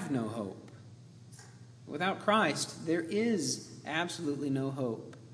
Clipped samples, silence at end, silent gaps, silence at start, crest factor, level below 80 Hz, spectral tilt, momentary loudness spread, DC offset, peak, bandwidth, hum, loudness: under 0.1%; 0 s; none; 0 s; 22 dB; -78 dBFS; -4.5 dB/octave; 24 LU; under 0.1%; -12 dBFS; 11 kHz; none; -33 LUFS